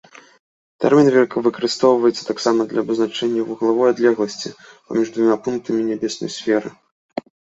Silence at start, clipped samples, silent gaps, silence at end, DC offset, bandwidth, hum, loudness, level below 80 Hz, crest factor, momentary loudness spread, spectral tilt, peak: 0.8 s; under 0.1%; 6.91-7.09 s; 0.4 s; under 0.1%; 8 kHz; none; -18 LUFS; -64 dBFS; 16 dB; 13 LU; -5 dB/octave; -2 dBFS